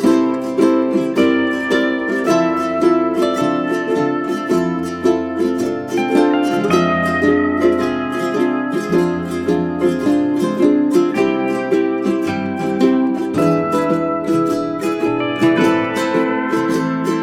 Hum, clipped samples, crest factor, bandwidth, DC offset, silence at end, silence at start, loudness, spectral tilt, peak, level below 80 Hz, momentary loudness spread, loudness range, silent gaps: none; under 0.1%; 14 dB; 14.5 kHz; under 0.1%; 0 s; 0 s; -17 LUFS; -6 dB/octave; -2 dBFS; -52 dBFS; 4 LU; 1 LU; none